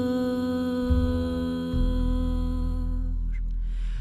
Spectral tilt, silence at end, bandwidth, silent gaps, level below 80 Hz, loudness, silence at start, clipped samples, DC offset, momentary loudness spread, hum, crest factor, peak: -8.5 dB/octave; 0 s; 10.5 kHz; none; -28 dBFS; -28 LUFS; 0 s; under 0.1%; under 0.1%; 8 LU; none; 14 dB; -10 dBFS